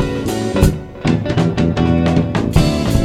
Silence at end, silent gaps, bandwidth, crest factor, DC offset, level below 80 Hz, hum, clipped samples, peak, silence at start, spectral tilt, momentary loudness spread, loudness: 0 s; none; 15.5 kHz; 14 dB; under 0.1%; -24 dBFS; none; under 0.1%; 0 dBFS; 0 s; -6.5 dB/octave; 4 LU; -16 LUFS